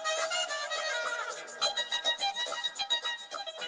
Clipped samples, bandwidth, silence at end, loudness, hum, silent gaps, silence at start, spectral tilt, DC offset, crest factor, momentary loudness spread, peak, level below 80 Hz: under 0.1%; 10 kHz; 0 s; -32 LUFS; none; none; 0 s; 2.5 dB/octave; under 0.1%; 16 dB; 7 LU; -18 dBFS; -80 dBFS